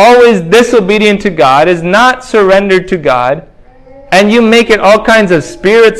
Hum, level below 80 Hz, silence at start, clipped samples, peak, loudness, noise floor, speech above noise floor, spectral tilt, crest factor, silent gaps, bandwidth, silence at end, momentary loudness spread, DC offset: none; -38 dBFS; 0 s; 5%; 0 dBFS; -7 LUFS; -35 dBFS; 29 dB; -5 dB/octave; 6 dB; none; 16 kHz; 0 s; 5 LU; under 0.1%